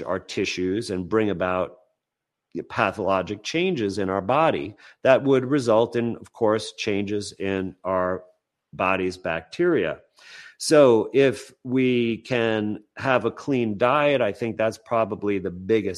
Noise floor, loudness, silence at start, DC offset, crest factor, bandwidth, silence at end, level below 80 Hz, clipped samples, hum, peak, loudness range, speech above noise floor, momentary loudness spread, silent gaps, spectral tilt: -84 dBFS; -23 LUFS; 0 s; under 0.1%; 22 dB; 12.5 kHz; 0 s; -60 dBFS; under 0.1%; none; -2 dBFS; 5 LU; 61 dB; 10 LU; none; -5.5 dB/octave